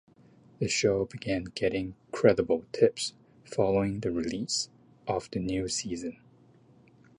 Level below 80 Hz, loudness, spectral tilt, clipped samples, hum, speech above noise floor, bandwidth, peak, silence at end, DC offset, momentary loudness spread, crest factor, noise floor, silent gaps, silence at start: -56 dBFS; -29 LUFS; -4.5 dB/octave; under 0.1%; none; 30 dB; 11 kHz; -8 dBFS; 1.05 s; under 0.1%; 11 LU; 22 dB; -59 dBFS; none; 0.6 s